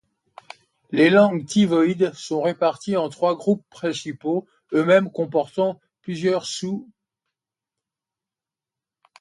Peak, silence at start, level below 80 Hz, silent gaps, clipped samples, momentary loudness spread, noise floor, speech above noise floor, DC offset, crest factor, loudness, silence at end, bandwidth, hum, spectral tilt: -4 dBFS; 0.9 s; -68 dBFS; none; under 0.1%; 11 LU; -89 dBFS; 69 dB; under 0.1%; 20 dB; -21 LUFS; 2.35 s; 11.5 kHz; none; -5.5 dB/octave